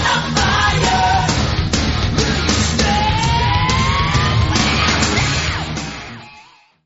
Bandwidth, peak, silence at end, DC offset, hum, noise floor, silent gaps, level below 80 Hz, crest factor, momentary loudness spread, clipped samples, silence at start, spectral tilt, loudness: 8.2 kHz; 0 dBFS; 0.45 s; 0.2%; none; -46 dBFS; none; -26 dBFS; 16 dB; 8 LU; under 0.1%; 0 s; -4 dB/octave; -15 LUFS